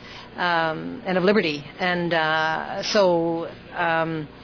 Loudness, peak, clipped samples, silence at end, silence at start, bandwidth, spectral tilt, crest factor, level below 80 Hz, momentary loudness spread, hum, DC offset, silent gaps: -23 LUFS; -8 dBFS; under 0.1%; 0 s; 0 s; 5.4 kHz; -5 dB/octave; 16 dB; -56 dBFS; 8 LU; 60 Hz at -55 dBFS; under 0.1%; none